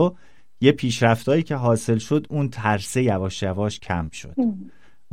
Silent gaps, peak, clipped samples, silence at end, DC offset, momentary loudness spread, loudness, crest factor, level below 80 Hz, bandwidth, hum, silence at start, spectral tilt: none; -2 dBFS; under 0.1%; 0.45 s; 0.7%; 8 LU; -22 LUFS; 20 dB; -50 dBFS; 15.5 kHz; none; 0 s; -6 dB/octave